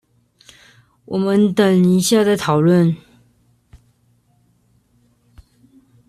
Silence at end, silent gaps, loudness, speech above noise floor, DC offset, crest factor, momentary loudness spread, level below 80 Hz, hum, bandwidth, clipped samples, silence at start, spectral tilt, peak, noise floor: 3.1 s; none; -15 LUFS; 45 dB; under 0.1%; 16 dB; 8 LU; -56 dBFS; none; 13 kHz; under 0.1%; 1.1 s; -6 dB/octave; -2 dBFS; -59 dBFS